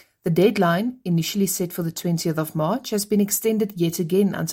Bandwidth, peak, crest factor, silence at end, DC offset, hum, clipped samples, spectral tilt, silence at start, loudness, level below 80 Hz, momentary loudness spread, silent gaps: 17 kHz; -6 dBFS; 16 dB; 0 s; under 0.1%; none; under 0.1%; -5.5 dB/octave; 0.25 s; -22 LUFS; -62 dBFS; 6 LU; none